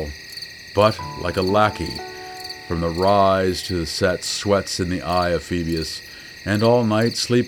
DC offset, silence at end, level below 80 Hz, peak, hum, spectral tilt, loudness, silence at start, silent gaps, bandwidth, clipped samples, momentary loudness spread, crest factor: under 0.1%; 0 s; -42 dBFS; -2 dBFS; none; -5 dB/octave; -20 LUFS; 0 s; none; over 20 kHz; under 0.1%; 15 LU; 18 dB